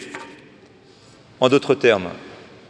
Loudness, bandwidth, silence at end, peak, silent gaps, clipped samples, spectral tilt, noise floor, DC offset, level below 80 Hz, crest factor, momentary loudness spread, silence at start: -18 LUFS; 10.5 kHz; 0.35 s; 0 dBFS; none; under 0.1%; -5 dB/octave; -49 dBFS; under 0.1%; -64 dBFS; 22 dB; 23 LU; 0 s